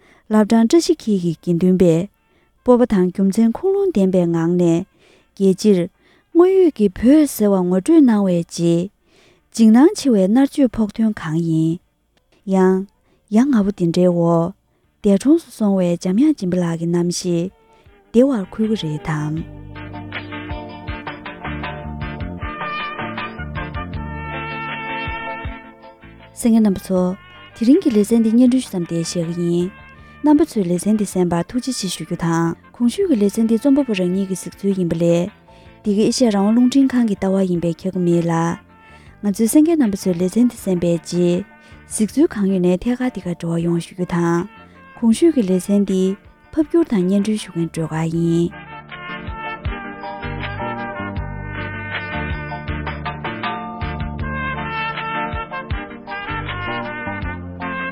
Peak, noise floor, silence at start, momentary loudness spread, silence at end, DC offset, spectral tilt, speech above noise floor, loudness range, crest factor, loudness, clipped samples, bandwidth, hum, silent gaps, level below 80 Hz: 0 dBFS; -61 dBFS; 0.3 s; 14 LU; 0 s; under 0.1%; -6.5 dB/octave; 45 dB; 10 LU; 18 dB; -18 LUFS; under 0.1%; 16 kHz; none; none; -40 dBFS